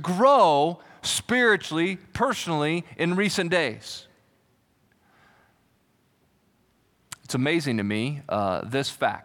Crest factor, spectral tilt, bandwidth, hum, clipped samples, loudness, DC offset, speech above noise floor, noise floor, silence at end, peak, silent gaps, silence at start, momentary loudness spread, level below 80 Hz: 18 dB; -4.5 dB/octave; 18.5 kHz; none; under 0.1%; -24 LUFS; under 0.1%; 42 dB; -66 dBFS; 0.05 s; -8 dBFS; none; 0 s; 12 LU; -62 dBFS